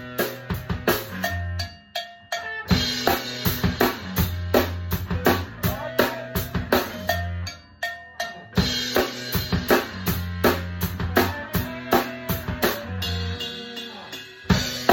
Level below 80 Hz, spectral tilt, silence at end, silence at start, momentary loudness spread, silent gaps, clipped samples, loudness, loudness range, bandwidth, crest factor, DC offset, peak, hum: -38 dBFS; -4.5 dB/octave; 0 s; 0 s; 10 LU; none; under 0.1%; -25 LUFS; 3 LU; 17 kHz; 22 dB; under 0.1%; -2 dBFS; none